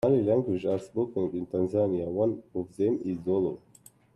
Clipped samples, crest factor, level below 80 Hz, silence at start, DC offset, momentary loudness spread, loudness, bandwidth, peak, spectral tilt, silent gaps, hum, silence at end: under 0.1%; 16 dB; -64 dBFS; 0.05 s; under 0.1%; 6 LU; -29 LUFS; 12 kHz; -12 dBFS; -9 dB/octave; none; none; 0.6 s